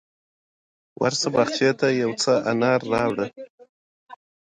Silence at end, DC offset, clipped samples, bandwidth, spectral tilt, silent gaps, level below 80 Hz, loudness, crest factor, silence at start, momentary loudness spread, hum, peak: 0.25 s; under 0.1%; under 0.1%; 10 kHz; -4.5 dB/octave; 3.50-3.58 s, 3.69-4.07 s; -62 dBFS; -22 LUFS; 18 dB; 1 s; 5 LU; none; -6 dBFS